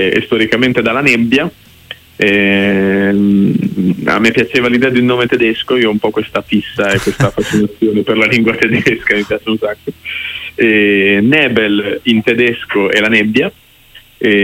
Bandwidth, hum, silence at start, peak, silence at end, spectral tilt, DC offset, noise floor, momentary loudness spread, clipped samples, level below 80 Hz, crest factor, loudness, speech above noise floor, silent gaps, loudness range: 16.5 kHz; none; 0 s; 0 dBFS; 0 s; -5.5 dB/octave; under 0.1%; -41 dBFS; 8 LU; under 0.1%; -44 dBFS; 12 dB; -12 LUFS; 30 dB; none; 2 LU